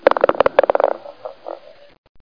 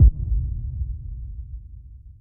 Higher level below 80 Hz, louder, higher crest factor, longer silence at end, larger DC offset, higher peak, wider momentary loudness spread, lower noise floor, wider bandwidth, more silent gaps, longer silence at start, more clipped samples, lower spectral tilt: second, -52 dBFS vs -24 dBFS; first, -17 LUFS vs -28 LUFS; about the same, 18 dB vs 18 dB; first, 0.8 s vs 0.1 s; first, 0.4% vs under 0.1%; first, 0 dBFS vs -4 dBFS; about the same, 20 LU vs 18 LU; second, -37 dBFS vs -42 dBFS; first, 5.2 kHz vs 0.6 kHz; neither; about the same, 0.05 s vs 0 s; neither; second, -6.5 dB/octave vs -19 dB/octave